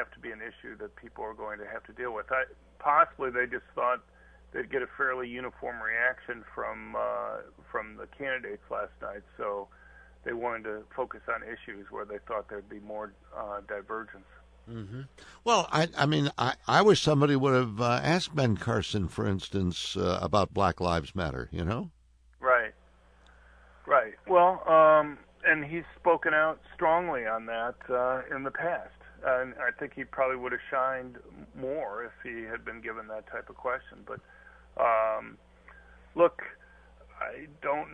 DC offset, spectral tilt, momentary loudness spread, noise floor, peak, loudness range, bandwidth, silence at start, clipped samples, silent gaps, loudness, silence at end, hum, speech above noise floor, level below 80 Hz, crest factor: under 0.1%; -5.5 dB/octave; 18 LU; -59 dBFS; -8 dBFS; 12 LU; 10.5 kHz; 0 s; under 0.1%; none; -29 LUFS; 0 s; none; 30 dB; -56 dBFS; 22 dB